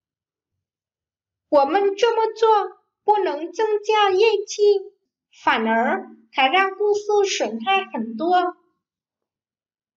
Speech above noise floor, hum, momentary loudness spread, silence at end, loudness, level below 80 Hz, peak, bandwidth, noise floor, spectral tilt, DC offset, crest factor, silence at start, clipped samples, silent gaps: over 71 dB; none; 8 LU; 1.45 s; -20 LUFS; -76 dBFS; -6 dBFS; 7.6 kHz; under -90 dBFS; -2.5 dB/octave; under 0.1%; 16 dB; 1.5 s; under 0.1%; none